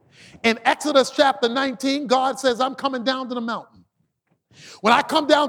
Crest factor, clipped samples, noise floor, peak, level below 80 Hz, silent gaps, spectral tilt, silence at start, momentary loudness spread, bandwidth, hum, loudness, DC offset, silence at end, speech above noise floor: 20 dB; under 0.1%; -70 dBFS; -2 dBFS; -66 dBFS; none; -3 dB/octave; 0.45 s; 8 LU; 17 kHz; none; -20 LUFS; under 0.1%; 0 s; 49 dB